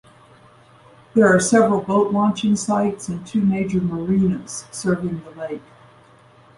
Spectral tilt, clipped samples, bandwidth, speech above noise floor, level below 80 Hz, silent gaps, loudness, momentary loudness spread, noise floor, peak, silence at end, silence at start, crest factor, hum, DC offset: -6 dB/octave; under 0.1%; 11.5 kHz; 31 dB; -52 dBFS; none; -19 LUFS; 16 LU; -50 dBFS; -4 dBFS; 1 s; 1.15 s; 18 dB; none; under 0.1%